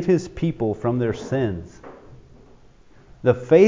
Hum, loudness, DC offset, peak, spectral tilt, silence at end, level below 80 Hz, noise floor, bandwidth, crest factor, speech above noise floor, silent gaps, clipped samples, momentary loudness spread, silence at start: none; -23 LUFS; under 0.1%; -2 dBFS; -8 dB/octave; 0 s; -46 dBFS; -49 dBFS; 7.6 kHz; 20 dB; 30 dB; none; under 0.1%; 19 LU; 0 s